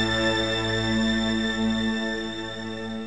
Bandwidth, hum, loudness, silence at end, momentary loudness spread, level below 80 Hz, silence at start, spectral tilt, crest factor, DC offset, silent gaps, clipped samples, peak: 9.8 kHz; none; -25 LUFS; 0 s; 9 LU; -44 dBFS; 0 s; -4.5 dB/octave; 14 dB; 0.5%; none; under 0.1%; -12 dBFS